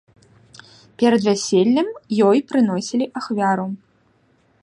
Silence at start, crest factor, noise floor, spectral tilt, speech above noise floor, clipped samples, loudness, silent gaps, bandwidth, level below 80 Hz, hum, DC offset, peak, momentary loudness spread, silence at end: 1 s; 16 dB; -60 dBFS; -5.5 dB/octave; 42 dB; under 0.1%; -19 LUFS; none; 11 kHz; -66 dBFS; none; under 0.1%; -4 dBFS; 8 LU; 0.85 s